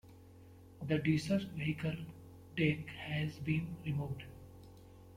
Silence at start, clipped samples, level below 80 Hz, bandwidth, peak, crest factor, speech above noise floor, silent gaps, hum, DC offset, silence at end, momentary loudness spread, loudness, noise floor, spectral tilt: 0.05 s; under 0.1%; -62 dBFS; 15 kHz; -20 dBFS; 20 dB; 21 dB; none; none; under 0.1%; 0 s; 24 LU; -37 LUFS; -57 dBFS; -7 dB/octave